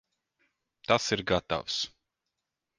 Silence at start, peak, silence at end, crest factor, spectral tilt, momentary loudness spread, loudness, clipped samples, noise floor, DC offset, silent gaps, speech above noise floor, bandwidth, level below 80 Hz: 0.9 s; -8 dBFS; 0.9 s; 26 dB; -3.5 dB/octave; 9 LU; -29 LUFS; under 0.1%; -86 dBFS; under 0.1%; none; 57 dB; 10.5 kHz; -56 dBFS